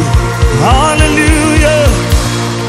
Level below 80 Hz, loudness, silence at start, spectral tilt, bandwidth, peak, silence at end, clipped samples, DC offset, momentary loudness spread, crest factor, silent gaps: -14 dBFS; -9 LUFS; 0 s; -5 dB/octave; 16 kHz; 0 dBFS; 0 s; 0.9%; 0.3%; 4 LU; 8 dB; none